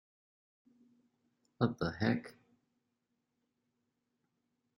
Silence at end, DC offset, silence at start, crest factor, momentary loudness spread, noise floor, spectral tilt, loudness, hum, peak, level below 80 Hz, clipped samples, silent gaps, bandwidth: 2.45 s; under 0.1%; 1.6 s; 28 dB; 7 LU; -84 dBFS; -7.5 dB/octave; -36 LUFS; none; -16 dBFS; -70 dBFS; under 0.1%; none; 11.5 kHz